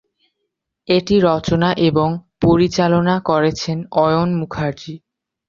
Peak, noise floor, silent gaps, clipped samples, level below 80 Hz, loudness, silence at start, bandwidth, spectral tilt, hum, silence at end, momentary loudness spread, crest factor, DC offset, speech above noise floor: -2 dBFS; -76 dBFS; none; under 0.1%; -44 dBFS; -17 LUFS; 0.9 s; 7.4 kHz; -6.5 dB/octave; none; 0.5 s; 9 LU; 14 dB; under 0.1%; 60 dB